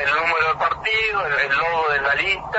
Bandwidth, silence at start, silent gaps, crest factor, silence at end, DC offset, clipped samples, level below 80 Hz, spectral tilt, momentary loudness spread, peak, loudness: 8 kHz; 0 s; none; 14 dB; 0 s; under 0.1%; under 0.1%; -48 dBFS; -3 dB/octave; 1 LU; -6 dBFS; -19 LUFS